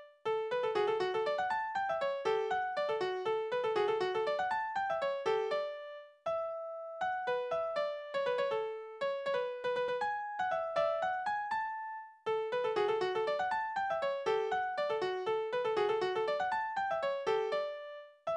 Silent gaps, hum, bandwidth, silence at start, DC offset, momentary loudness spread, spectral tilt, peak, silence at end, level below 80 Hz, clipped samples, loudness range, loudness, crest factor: none; none; 9.8 kHz; 0 s; under 0.1%; 6 LU; -4 dB/octave; -20 dBFS; 0 s; -76 dBFS; under 0.1%; 2 LU; -35 LUFS; 16 dB